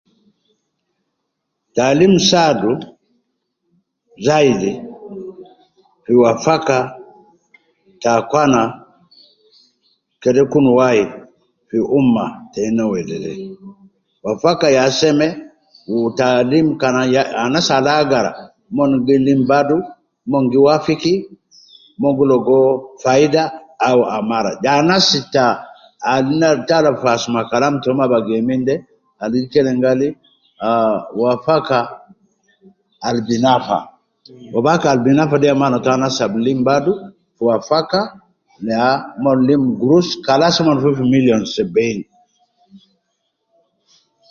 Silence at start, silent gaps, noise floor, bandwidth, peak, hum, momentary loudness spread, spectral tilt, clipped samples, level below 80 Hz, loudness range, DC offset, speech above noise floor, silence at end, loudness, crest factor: 1.75 s; none; -74 dBFS; 7.4 kHz; 0 dBFS; none; 11 LU; -5.5 dB/octave; under 0.1%; -54 dBFS; 4 LU; under 0.1%; 60 dB; 1.55 s; -15 LUFS; 16 dB